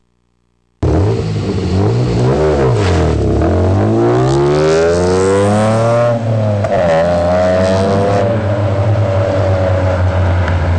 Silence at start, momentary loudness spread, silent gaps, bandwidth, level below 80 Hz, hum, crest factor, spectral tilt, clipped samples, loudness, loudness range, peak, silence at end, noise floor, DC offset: 0.8 s; 3 LU; none; 9.8 kHz; -28 dBFS; none; 6 dB; -7.5 dB/octave; under 0.1%; -13 LUFS; 2 LU; -6 dBFS; 0 s; -60 dBFS; under 0.1%